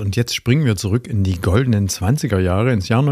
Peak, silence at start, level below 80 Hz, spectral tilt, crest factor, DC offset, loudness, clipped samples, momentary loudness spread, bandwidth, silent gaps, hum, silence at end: -2 dBFS; 0 s; -38 dBFS; -6 dB/octave; 16 dB; under 0.1%; -18 LUFS; under 0.1%; 3 LU; 15.5 kHz; none; none; 0 s